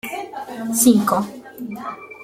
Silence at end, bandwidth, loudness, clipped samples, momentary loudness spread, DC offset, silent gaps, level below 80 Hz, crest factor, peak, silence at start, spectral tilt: 0 s; 16.5 kHz; -18 LUFS; under 0.1%; 18 LU; under 0.1%; none; -62 dBFS; 18 dB; -2 dBFS; 0.05 s; -4 dB/octave